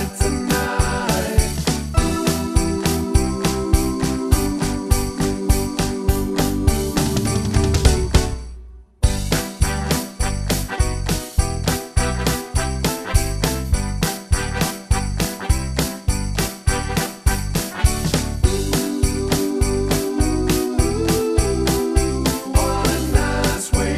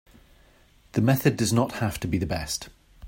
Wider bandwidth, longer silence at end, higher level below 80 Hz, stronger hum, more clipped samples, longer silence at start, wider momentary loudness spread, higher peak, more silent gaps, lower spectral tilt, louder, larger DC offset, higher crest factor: about the same, 15 kHz vs 16.5 kHz; about the same, 0 s vs 0 s; first, -24 dBFS vs -48 dBFS; neither; neither; second, 0 s vs 0.95 s; second, 4 LU vs 10 LU; first, 0 dBFS vs -6 dBFS; neither; about the same, -5 dB/octave vs -5.5 dB/octave; first, -20 LUFS vs -25 LUFS; neither; about the same, 20 dB vs 20 dB